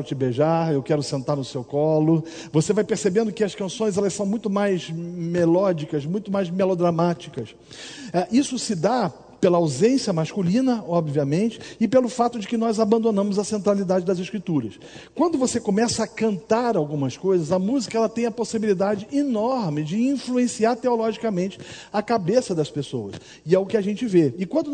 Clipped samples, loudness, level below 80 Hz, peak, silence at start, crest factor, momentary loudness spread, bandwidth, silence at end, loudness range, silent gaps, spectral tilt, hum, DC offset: under 0.1%; -23 LUFS; -62 dBFS; -4 dBFS; 0 s; 18 dB; 7 LU; 9.4 kHz; 0 s; 2 LU; none; -6 dB/octave; none; under 0.1%